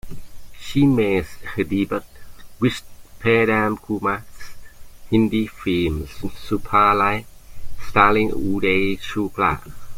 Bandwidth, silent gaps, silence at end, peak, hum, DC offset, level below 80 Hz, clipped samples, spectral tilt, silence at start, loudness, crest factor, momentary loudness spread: 16.5 kHz; none; 0 s; -2 dBFS; none; under 0.1%; -40 dBFS; under 0.1%; -6.5 dB/octave; 0.05 s; -20 LUFS; 18 dB; 13 LU